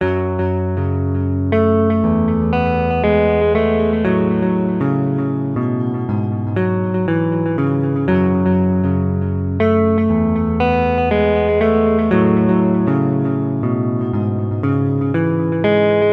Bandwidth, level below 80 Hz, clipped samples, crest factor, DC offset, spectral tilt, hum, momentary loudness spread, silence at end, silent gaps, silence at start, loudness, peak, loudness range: 5 kHz; -36 dBFS; under 0.1%; 14 dB; under 0.1%; -10.5 dB/octave; none; 5 LU; 0 s; none; 0 s; -17 LUFS; -2 dBFS; 3 LU